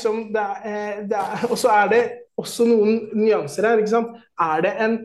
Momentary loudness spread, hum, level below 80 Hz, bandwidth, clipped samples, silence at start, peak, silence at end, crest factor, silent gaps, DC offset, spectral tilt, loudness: 11 LU; none; -70 dBFS; 12.5 kHz; under 0.1%; 0 s; -6 dBFS; 0 s; 14 dB; none; under 0.1%; -5 dB/octave; -20 LUFS